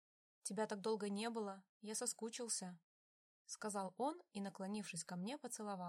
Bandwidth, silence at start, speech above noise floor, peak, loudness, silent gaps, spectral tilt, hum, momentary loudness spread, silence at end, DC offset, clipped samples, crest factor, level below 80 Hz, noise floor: 16 kHz; 0.45 s; over 44 dB; -28 dBFS; -46 LUFS; 1.69-1.80 s, 2.83-3.45 s; -3.5 dB/octave; none; 8 LU; 0 s; under 0.1%; under 0.1%; 20 dB; under -90 dBFS; under -90 dBFS